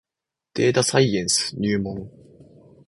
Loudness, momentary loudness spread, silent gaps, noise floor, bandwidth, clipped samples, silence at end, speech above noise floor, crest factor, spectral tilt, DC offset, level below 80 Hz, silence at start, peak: -21 LUFS; 14 LU; none; -87 dBFS; 11.5 kHz; under 0.1%; 0.8 s; 65 dB; 20 dB; -4 dB/octave; under 0.1%; -54 dBFS; 0.55 s; -2 dBFS